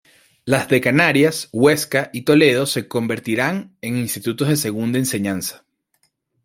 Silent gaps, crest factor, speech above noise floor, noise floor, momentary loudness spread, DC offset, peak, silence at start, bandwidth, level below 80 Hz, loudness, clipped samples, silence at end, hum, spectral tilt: none; 18 dB; 49 dB; -67 dBFS; 10 LU; under 0.1%; 0 dBFS; 0.45 s; 16.5 kHz; -60 dBFS; -18 LUFS; under 0.1%; 0.9 s; none; -4.5 dB/octave